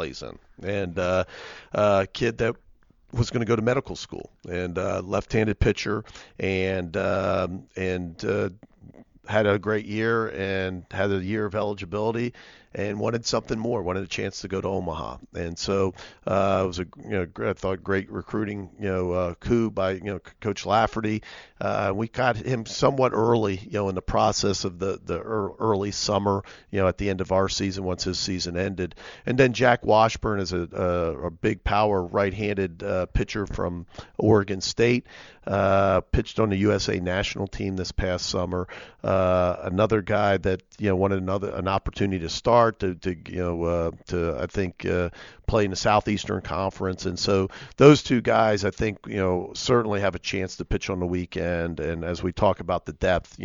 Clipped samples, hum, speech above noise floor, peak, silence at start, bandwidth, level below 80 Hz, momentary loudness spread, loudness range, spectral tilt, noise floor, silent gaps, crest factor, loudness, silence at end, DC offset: under 0.1%; none; 31 dB; 0 dBFS; 0 s; 7.6 kHz; -42 dBFS; 10 LU; 5 LU; -5.5 dB/octave; -56 dBFS; none; 24 dB; -25 LUFS; 0 s; under 0.1%